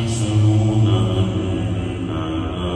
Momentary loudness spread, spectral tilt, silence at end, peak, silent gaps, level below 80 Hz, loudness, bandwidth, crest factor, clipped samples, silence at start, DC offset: 8 LU; -7 dB/octave; 0 s; -6 dBFS; none; -34 dBFS; -19 LUFS; 10 kHz; 14 dB; under 0.1%; 0 s; under 0.1%